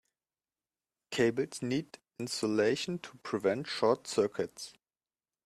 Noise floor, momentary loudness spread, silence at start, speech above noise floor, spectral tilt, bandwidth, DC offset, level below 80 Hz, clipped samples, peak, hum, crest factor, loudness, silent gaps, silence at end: under -90 dBFS; 12 LU; 1.1 s; over 58 dB; -4.5 dB/octave; 14 kHz; under 0.1%; -74 dBFS; under 0.1%; -14 dBFS; none; 20 dB; -33 LUFS; none; 0.75 s